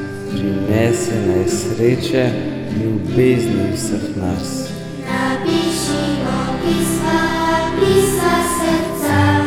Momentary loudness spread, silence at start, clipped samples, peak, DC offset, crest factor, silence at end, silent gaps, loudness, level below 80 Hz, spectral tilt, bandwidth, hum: 8 LU; 0 s; under 0.1%; -2 dBFS; under 0.1%; 16 dB; 0 s; none; -17 LUFS; -38 dBFS; -5.5 dB/octave; 18 kHz; none